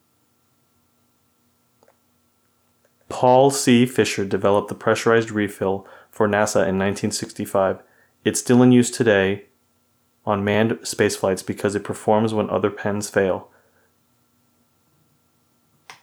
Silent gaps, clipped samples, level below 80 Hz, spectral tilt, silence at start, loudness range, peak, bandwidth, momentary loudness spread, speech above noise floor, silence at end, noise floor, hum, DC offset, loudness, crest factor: none; under 0.1%; -66 dBFS; -5 dB/octave; 3.1 s; 5 LU; -4 dBFS; 19 kHz; 10 LU; 45 dB; 0.1 s; -64 dBFS; none; under 0.1%; -20 LUFS; 18 dB